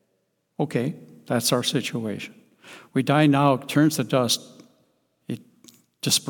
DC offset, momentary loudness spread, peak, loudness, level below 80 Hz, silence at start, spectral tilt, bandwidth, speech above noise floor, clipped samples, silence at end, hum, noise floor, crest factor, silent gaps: under 0.1%; 17 LU; -4 dBFS; -23 LUFS; -72 dBFS; 0.6 s; -4.5 dB/octave; 19 kHz; 50 dB; under 0.1%; 0 s; none; -72 dBFS; 20 dB; none